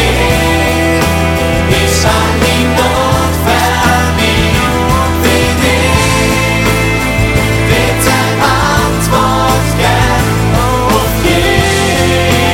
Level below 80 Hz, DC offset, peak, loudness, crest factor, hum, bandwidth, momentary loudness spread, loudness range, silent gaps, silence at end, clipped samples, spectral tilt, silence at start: -20 dBFS; under 0.1%; 0 dBFS; -10 LUFS; 10 dB; none; 17 kHz; 2 LU; 0 LU; none; 0 s; under 0.1%; -4.5 dB/octave; 0 s